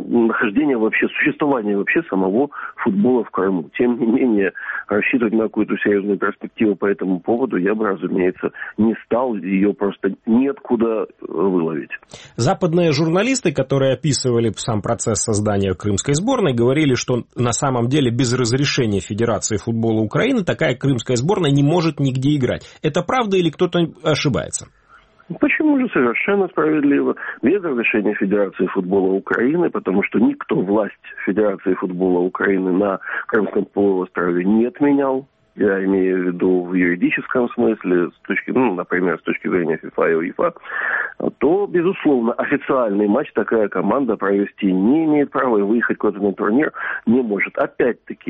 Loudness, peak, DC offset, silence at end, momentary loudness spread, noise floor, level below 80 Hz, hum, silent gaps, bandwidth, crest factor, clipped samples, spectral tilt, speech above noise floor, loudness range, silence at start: -18 LUFS; -2 dBFS; under 0.1%; 0 s; 5 LU; -50 dBFS; -52 dBFS; none; none; 8.8 kHz; 16 dB; under 0.1%; -5.5 dB/octave; 32 dB; 2 LU; 0 s